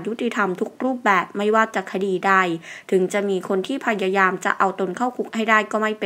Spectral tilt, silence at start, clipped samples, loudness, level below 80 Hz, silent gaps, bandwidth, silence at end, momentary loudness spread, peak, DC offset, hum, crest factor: -5 dB/octave; 0 s; under 0.1%; -21 LUFS; -76 dBFS; none; 16 kHz; 0 s; 7 LU; 0 dBFS; under 0.1%; none; 22 dB